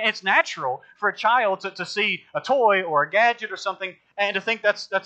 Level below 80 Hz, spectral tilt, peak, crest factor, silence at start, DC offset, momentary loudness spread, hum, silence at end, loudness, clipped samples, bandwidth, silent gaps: -80 dBFS; -3 dB/octave; -6 dBFS; 18 dB; 0 s; under 0.1%; 10 LU; none; 0.05 s; -22 LUFS; under 0.1%; 8.8 kHz; none